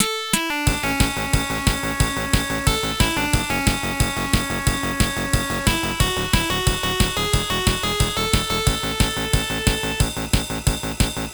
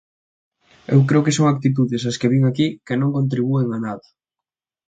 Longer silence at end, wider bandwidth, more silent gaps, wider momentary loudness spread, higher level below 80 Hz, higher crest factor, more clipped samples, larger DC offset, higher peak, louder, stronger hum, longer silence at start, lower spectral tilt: second, 0 s vs 0.9 s; first, over 20 kHz vs 9.2 kHz; neither; second, 2 LU vs 7 LU; first, -28 dBFS vs -60 dBFS; about the same, 20 dB vs 16 dB; neither; neither; about the same, -2 dBFS vs -2 dBFS; about the same, -21 LUFS vs -19 LUFS; neither; second, 0 s vs 0.9 s; second, -3.5 dB/octave vs -6.5 dB/octave